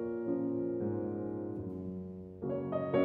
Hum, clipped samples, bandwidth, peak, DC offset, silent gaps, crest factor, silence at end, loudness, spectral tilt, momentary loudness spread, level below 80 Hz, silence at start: none; under 0.1%; 4.2 kHz; -18 dBFS; under 0.1%; none; 18 dB; 0 s; -37 LUFS; -11 dB/octave; 8 LU; -66 dBFS; 0 s